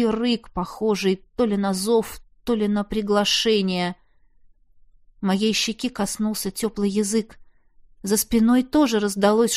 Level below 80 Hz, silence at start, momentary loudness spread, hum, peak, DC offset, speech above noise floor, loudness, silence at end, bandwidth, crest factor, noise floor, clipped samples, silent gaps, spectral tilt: -48 dBFS; 0 s; 9 LU; none; -6 dBFS; under 0.1%; 33 dB; -22 LUFS; 0 s; 15.5 kHz; 16 dB; -54 dBFS; under 0.1%; none; -4 dB/octave